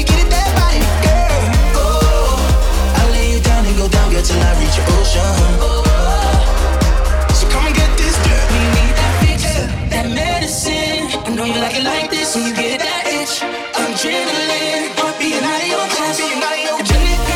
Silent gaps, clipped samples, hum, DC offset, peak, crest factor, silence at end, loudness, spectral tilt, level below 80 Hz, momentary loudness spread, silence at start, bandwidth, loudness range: none; under 0.1%; none; under 0.1%; 0 dBFS; 12 dB; 0 s; -15 LUFS; -4 dB/octave; -16 dBFS; 3 LU; 0 s; 17 kHz; 3 LU